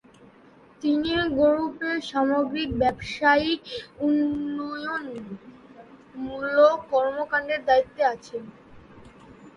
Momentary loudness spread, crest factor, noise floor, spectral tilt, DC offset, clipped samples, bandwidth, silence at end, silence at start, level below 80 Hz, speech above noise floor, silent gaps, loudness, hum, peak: 17 LU; 18 dB; -53 dBFS; -5.5 dB/octave; under 0.1%; under 0.1%; 10.5 kHz; 0.05 s; 0.8 s; -52 dBFS; 29 dB; none; -24 LUFS; none; -6 dBFS